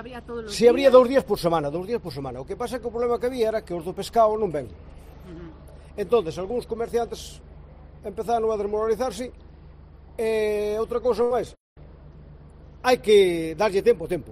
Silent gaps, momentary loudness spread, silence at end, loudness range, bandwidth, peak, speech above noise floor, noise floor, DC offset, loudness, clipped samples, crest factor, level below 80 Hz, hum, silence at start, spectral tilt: 11.60-11.76 s; 19 LU; 0 s; 7 LU; 15.5 kHz; -4 dBFS; 23 dB; -46 dBFS; under 0.1%; -23 LUFS; under 0.1%; 20 dB; -46 dBFS; none; 0 s; -5 dB/octave